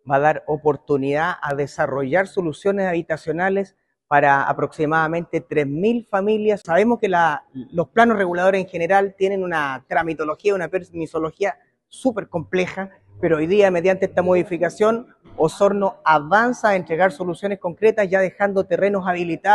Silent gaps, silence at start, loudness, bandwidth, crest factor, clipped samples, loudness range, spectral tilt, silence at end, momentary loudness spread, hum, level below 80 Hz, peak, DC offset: none; 0.05 s; -20 LUFS; 11.5 kHz; 20 dB; under 0.1%; 4 LU; -6.5 dB/octave; 0 s; 9 LU; none; -56 dBFS; 0 dBFS; under 0.1%